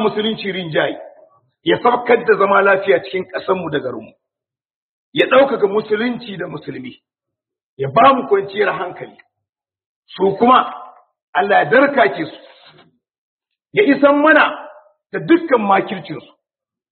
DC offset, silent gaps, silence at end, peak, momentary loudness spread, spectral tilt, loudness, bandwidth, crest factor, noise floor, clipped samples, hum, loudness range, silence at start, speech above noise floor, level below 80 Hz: under 0.1%; 4.76-5.12 s, 7.63-7.77 s, 9.49-9.53 s, 9.86-10.02 s, 11.22-11.33 s, 13.18-13.38 s; 0.7 s; 0 dBFS; 17 LU; -3 dB/octave; -15 LUFS; 4.5 kHz; 18 dB; -87 dBFS; under 0.1%; none; 4 LU; 0 s; 72 dB; -60 dBFS